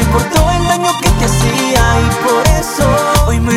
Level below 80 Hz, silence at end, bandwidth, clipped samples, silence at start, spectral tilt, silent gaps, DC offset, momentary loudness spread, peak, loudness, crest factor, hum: -18 dBFS; 0 s; 16.5 kHz; under 0.1%; 0 s; -4.5 dB/octave; none; under 0.1%; 2 LU; 0 dBFS; -12 LUFS; 10 dB; none